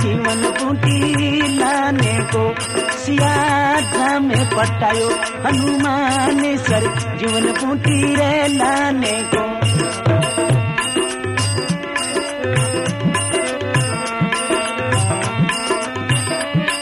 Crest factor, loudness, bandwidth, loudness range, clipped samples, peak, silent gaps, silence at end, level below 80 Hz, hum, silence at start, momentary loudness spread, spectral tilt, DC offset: 14 dB; -17 LUFS; 14.5 kHz; 2 LU; under 0.1%; -4 dBFS; none; 0 s; -46 dBFS; none; 0 s; 4 LU; -4.5 dB/octave; under 0.1%